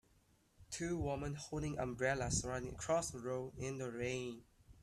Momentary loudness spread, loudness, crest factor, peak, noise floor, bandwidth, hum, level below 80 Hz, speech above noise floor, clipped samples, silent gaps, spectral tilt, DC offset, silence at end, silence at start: 7 LU; -41 LUFS; 18 dB; -22 dBFS; -73 dBFS; 14.5 kHz; none; -58 dBFS; 32 dB; under 0.1%; none; -4.5 dB/octave; under 0.1%; 0 s; 0.6 s